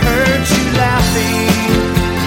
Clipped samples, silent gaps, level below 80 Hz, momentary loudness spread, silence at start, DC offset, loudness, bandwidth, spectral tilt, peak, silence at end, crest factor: under 0.1%; none; -24 dBFS; 2 LU; 0 s; under 0.1%; -13 LUFS; 17 kHz; -4.5 dB/octave; 0 dBFS; 0 s; 12 dB